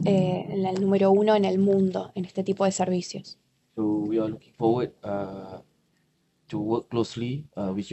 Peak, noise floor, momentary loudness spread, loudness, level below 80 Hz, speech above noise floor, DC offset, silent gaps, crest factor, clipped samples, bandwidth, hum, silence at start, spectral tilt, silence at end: -8 dBFS; -69 dBFS; 16 LU; -26 LUFS; -64 dBFS; 44 dB; under 0.1%; none; 18 dB; under 0.1%; 8.4 kHz; none; 0 s; -7 dB/octave; 0 s